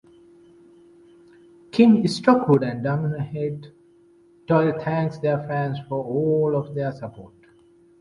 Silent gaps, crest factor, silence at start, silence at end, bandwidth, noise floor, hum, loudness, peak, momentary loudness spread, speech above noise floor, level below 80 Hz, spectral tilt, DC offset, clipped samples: none; 20 dB; 1.75 s; 0.75 s; 11 kHz; -55 dBFS; none; -22 LUFS; -4 dBFS; 12 LU; 34 dB; -60 dBFS; -8 dB/octave; under 0.1%; under 0.1%